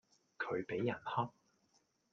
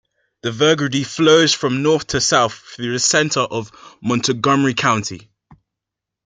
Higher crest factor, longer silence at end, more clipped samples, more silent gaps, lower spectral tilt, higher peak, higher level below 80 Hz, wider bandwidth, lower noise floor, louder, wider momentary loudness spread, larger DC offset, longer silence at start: about the same, 20 dB vs 16 dB; about the same, 0.8 s vs 0.7 s; neither; neither; first, -7.5 dB/octave vs -3.5 dB/octave; second, -24 dBFS vs -2 dBFS; second, -80 dBFS vs -52 dBFS; second, 7.4 kHz vs 9.6 kHz; second, -77 dBFS vs -83 dBFS; second, -40 LUFS vs -16 LUFS; second, 6 LU vs 14 LU; neither; about the same, 0.4 s vs 0.45 s